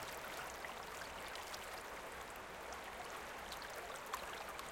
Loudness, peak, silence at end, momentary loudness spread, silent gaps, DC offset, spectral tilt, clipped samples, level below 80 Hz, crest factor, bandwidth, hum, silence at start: -48 LUFS; -26 dBFS; 0 s; 3 LU; none; under 0.1%; -2 dB/octave; under 0.1%; -66 dBFS; 22 dB; 17 kHz; none; 0 s